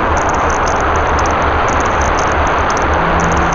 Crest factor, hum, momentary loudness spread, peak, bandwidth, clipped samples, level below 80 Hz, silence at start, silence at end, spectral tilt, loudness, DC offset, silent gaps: 12 dB; none; 1 LU; 0 dBFS; 7.6 kHz; under 0.1%; -22 dBFS; 0 s; 0 s; -4.5 dB/octave; -13 LUFS; 2%; none